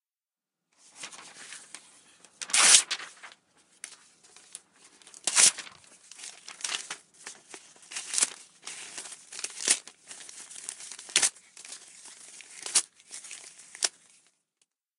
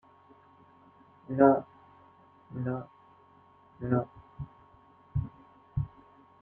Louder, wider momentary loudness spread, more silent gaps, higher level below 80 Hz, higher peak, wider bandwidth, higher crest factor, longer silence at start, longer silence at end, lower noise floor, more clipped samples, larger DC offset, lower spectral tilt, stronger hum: first, -24 LUFS vs -30 LUFS; first, 26 LU vs 23 LU; neither; second, -84 dBFS vs -54 dBFS; first, 0 dBFS vs -10 dBFS; first, 16 kHz vs 3.5 kHz; first, 32 dB vs 24 dB; second, 1 s vs 1.3 s; first, 1.1 s vs 0.55 s; first, under -90 dBFS vs -60 dBFS; neither; neither; second, 3 dB/octave vs -12 dB/octave; neither